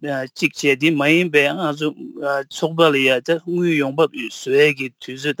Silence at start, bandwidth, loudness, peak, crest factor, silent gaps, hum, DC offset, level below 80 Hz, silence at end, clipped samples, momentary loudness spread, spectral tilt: 0 s; 17 kHz; -18 LUFS; -2 dBFS; 18 dB; none; none; under 0.1%; -72 dBFS; 0.05 s; under 0.1%; 11 LU; -5 dB/octave